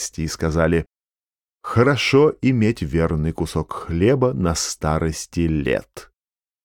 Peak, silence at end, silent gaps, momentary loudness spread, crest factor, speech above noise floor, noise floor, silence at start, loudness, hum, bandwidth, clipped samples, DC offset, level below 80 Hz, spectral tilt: -4 dBFS; 0.6 s; none; 10 LU; 16 dB; over 71 dB; under -90 dBFS; 0 s; -20 LUFS; none; 17 kHz; under 0.1%; under 0.1%; -36 dBFS; -5.5 dB/octave